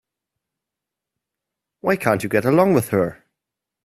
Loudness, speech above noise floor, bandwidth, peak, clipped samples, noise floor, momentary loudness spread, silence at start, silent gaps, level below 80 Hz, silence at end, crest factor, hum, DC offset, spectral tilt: -19 LUFS; 67 dB; 16 kHz; 0 dBFS; under 0.1%; -85 dBFS; 8 LU; 1.85 s; none; -58 dBFS; 0.75 s; 22 dB; none; under 0.1%; -6.5 dB/octave